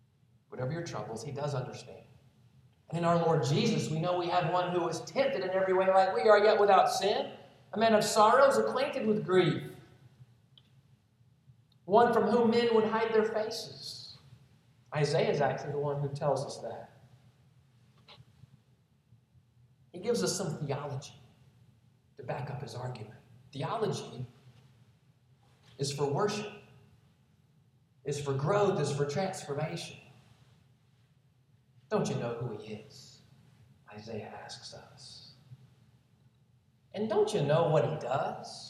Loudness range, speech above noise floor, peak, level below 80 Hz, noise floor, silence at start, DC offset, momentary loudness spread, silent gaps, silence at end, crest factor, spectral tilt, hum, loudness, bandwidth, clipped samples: 14 LU; 38 dB; -10 dBFS; -72 dBFS; -67 dBFS; 0.5 s; under 0.1%; 21 LU; none; 0 s; 22 dB; -5.5 dB/octave; none; -30 LUFS; 14 kHz; under 0.1%